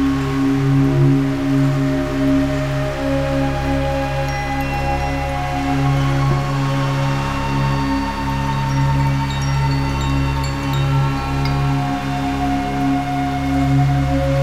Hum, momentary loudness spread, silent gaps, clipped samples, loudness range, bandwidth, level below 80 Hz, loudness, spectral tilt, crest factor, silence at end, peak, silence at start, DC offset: none; 5 LU; none; under 0.1%; 2 LU; 14 kHz; -28 dBFS; -18 LUFS; -7 dB/octave; 14 dB; 0 s; -4 dBFS; 0 s; 0.8%